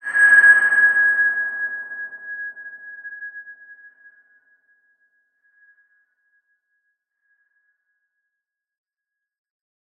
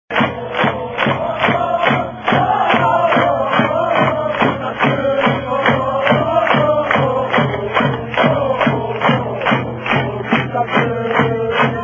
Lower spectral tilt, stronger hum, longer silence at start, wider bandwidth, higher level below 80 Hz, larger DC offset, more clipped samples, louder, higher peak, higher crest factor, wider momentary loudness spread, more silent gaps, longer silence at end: second, -0.5 dB/octave vs -7.5 dB/octave; neither; about the same, 0.05 s vs 0.1 s; first, 8.8 kHz vs 7.4 kHz; second, under -90 dBFS vs -44 dBFS; neither; neither; about the same, -14 LUFS vs -15 LUFS; about the same, -2 dBFS vs 0 dBFS; about the same, 20 dB vs 16 dB; first, 25 LU vs 4 LU; neither; first, 6.45 s vs 0 s